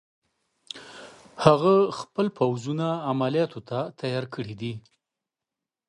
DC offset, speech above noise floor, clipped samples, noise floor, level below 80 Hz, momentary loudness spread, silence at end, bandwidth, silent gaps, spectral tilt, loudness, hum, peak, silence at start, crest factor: under 0.1%; 64 dB; under 0.1%; -88 dBFS; -60 dBFS; 21 LU; 1.1 s; 11 kHz; none; -7 dB/octave; -25 LUFS; none; -2 dBFS; 0.75 s; 24 dB